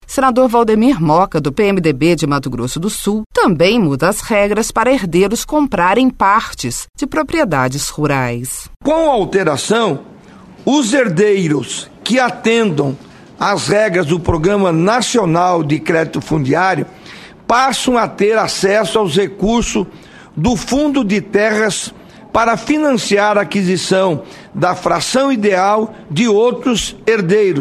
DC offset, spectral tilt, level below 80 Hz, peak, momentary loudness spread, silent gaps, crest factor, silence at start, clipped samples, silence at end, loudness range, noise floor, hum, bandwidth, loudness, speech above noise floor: under 0.1%; -5 dB/octave; -38 dBFS; 0 dBFS; 8 LU; 3.26-3.30 s; 14 dB; 0.1 s; under 0.1%; 0 s; 2 LU; -38 dBFS; none; 13.5 kHz; -14 LUFS; 25 dB